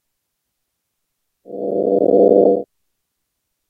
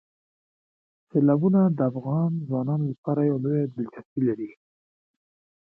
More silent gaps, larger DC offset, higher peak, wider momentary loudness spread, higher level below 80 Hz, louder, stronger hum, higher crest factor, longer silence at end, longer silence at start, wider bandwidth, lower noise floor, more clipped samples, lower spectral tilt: second, none vs 2.98-3.03 s, 4.05-4.16 s; neither; first, -2 dBFS vs -10 dBFS; first, 14 LU vs 11 LU; about the same, -72 dBFS vs -70 dBFS; first, -15 LUFS vs -25 LUFS; neither; about the same, 18 dB vs 16 dB; about the same, 1.05 s vs 1.1 s; first, 1.5 s vs 1.15 s; second, 1.3 kHz vs 2.7 kHz; second, -75 dBFS vs under -90 dBFS; neither; about the same, -12.5 dB/octave vs -13.5 dB/octave